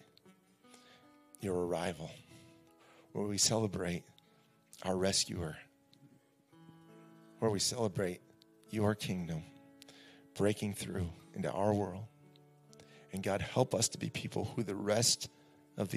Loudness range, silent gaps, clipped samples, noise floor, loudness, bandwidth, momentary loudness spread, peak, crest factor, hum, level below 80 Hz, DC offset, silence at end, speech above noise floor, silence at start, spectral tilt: 4 LU; none; under 0.1%; -68 dBFS; -35 LUFS; 15.5 kHz; 18 LU; -14 dBFS; 24 dB; none; -70 dBFS; under 0.1%; 0 s; 33 dB; 0.25 s; -4 dB/octave